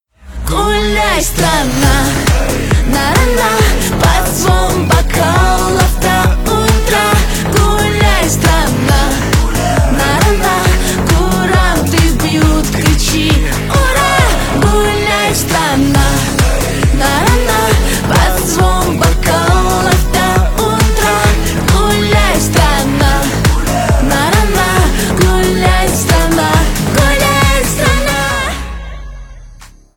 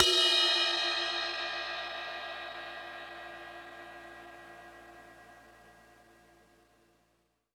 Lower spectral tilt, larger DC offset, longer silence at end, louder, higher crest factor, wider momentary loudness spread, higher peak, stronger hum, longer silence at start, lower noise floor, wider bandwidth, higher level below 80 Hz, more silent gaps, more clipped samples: first, -4.5 dB/octave vs -0.5 dB/octave; neither; second, 0.3 s vs 1.8 s; first, -11 LUFS vs -29 LUFS; second, 10 dB vs 28 dB; second, 2 LU vs 26 LU; first, 0 dBFS vs -8 dBFS; neither; first, 0.25 s vs 0 s; second, -36 dBFS vs -75 dBFS; about the same, 19.5 kHz vs 18 kHz; first, -16 dBFS vs -68 dBFS; neither; neither